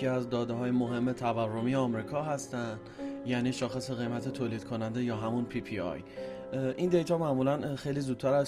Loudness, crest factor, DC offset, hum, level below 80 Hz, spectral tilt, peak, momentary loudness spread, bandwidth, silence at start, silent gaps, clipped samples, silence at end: -33 LUFS; 18 dB; under 0.1%; none; -62 dBFS; -6.5 dB/octave; -14 dBFS; 9 LU; 12.5 kHz; 0 s; none; under 0.1%; 0 s